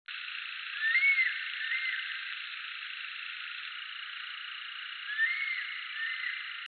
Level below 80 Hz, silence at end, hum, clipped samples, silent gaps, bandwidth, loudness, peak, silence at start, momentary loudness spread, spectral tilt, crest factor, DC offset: under -90 dBFS; 0 s; none; under 0.1%; none; 4.7 kHz; -32 LUFS; -18 dBFS; 0.1 s; 14 LU; 6.5 dB/octave; 18 dB; under 0.1%